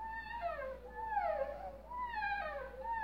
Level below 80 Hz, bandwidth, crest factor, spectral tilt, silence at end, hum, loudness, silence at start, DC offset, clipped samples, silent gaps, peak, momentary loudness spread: -56 dBFS; 16 kHz; 14 dB; -5.5 dB/octave; 0 s; none; -41 LUFS; 0 s; under 0.1%; under 0.1%; none; -26 dBFS; 8 LU